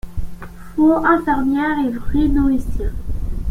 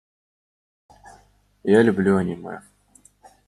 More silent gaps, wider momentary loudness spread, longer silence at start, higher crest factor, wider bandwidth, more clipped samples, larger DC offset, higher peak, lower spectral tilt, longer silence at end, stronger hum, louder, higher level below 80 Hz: neither; second, 17 LU vs 20 LU; second, 0.05 s vs 1.65 s; second, 14 dB vs 22 dB; first, 15.5 kHz vs 11.5 kHz; neither; neither; about the same, -2 dBFS vs -2 dBFS; about the same, -8 dB/octave vs -7.5 dB/octave; second, 0 s vs 0.9 s; second, none vs 50 Hz at -40 dBFS; about the same, -18 LUFS vs -20 LUFS; first, -26 dBFS vs -60 dBFS